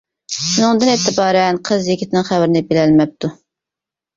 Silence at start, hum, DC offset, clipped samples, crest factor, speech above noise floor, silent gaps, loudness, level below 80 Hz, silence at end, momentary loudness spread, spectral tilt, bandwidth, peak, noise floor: 0.3 s; none; under 0.1%; under 0.1%; 14 dB; 72 dB; none; -15 LUFS; -54 dBFS; 0.85 s; 8 LU; -4.5 dB/octave; 7.8 kHz; -2 dBFS; -86 dBFS